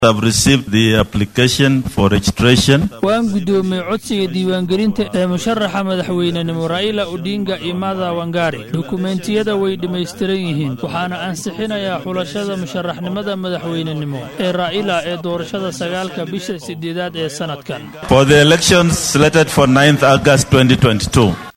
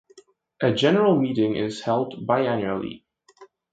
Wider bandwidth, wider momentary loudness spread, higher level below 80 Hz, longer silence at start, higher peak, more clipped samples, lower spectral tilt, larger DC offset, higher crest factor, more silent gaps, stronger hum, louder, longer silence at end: first, 17 kHz vs 9.2 kHz; first, 12 LU vs 9 LU; first, -38 dBFS vs -62 dBFS; second, 0 s vs 0.15 s; first, 0 dBFS vs -6 dBFS; neither; second, -5 dB/octave vs -6.5 dB/octave; neither; about the same, 16 dB vs 18 dB; neither; neither; first, -15 LUFS vs -23 LUFS; second, 0.05 s vs 0.25 s